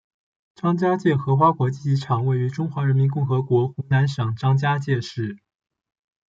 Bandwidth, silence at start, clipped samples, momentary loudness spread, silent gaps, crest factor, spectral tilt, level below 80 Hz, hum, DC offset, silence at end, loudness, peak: 7.6 kHz; 0.65 s; under 0.1%; 7 LU; none; 16 dB; -8 dB/octave; -62 dBFS; none; under 0.1%; 0.95 s; -22 LUFS; -6 dBFS